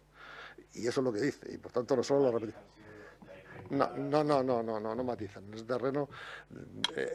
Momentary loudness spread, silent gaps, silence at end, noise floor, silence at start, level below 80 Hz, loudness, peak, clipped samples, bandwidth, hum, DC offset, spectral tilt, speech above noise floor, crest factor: 22 LU; none; 0 s; -53 dBFS; 0.15 s; -68 dBFS; -33 LUFS; -12 dBFS; under 0.1%; 12.5 kHz; none; under 0.1%; -5.5 dB/octave; 19 dB; 22 dB